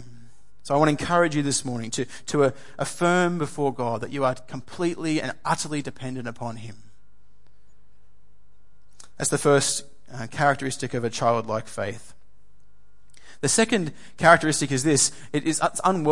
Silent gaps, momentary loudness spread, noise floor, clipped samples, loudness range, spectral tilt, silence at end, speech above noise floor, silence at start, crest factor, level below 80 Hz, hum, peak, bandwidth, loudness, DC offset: none; 14 LU; -62 dBFS; under 0.1%; 9 LU; -4 dB/octave; 0 s; 38 dB; 0 s; 24 dB; -60 dBFS; none; -2 dBFS; 11.5 kHz; -24 LUFS; 1%